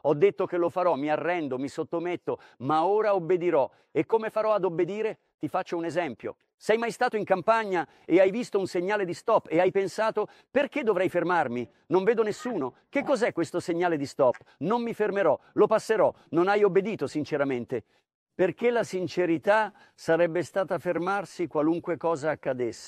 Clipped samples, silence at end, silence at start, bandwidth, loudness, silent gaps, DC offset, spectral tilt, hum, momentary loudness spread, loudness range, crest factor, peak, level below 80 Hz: under 0.1%; 0 s; 0.05 s; 13 kHz; -27 LUFS; 5.34-5.38 s, 6.54-6.58 s, 18.15-18.26 s; under 0.1%; -6 dB/octave; none; 8 LU; 3 LU; 18 dB; -8 dBFS; -72 dBFS